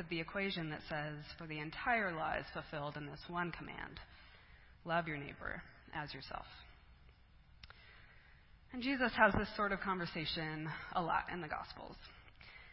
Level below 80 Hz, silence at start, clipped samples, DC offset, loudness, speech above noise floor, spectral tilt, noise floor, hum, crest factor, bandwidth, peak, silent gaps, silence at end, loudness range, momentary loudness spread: -60 dBFS; 0 s; under 0.1%; under 0.1%; -40 LUFS; 23 dB; -3 dB/octave; -63 dBFS; none; 26 dB; 5.6 kHz; -14 dBFS; none; 0 s; 11 LU; 22 LU